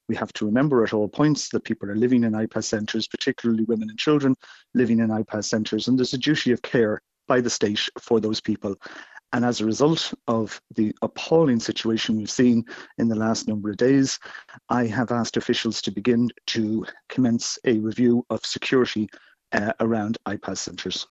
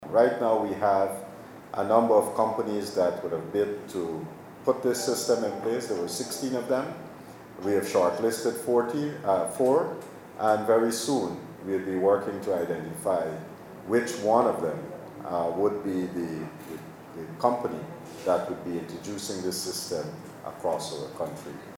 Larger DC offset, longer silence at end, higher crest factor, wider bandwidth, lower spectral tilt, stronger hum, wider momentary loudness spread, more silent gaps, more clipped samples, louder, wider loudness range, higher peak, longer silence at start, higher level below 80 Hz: neither; about the same, 0.1 s vs 0 s; about the same, 20 dB vs 22 dB; second, 8.2 kHz vs 19 kHz; about the same, -5 dB/octave vs -4.5 dB/octave; neither; second, 9 LU vs 17 LU; neither; neither; first, -23 LUFS vs -28 LUFS; second, 2 LU vs 5 LU; about the same, -4 dBFS vs -6 dBFS; about the same, 0.1 s vs 0 s; first, -60 dBFS vs -68 dBFS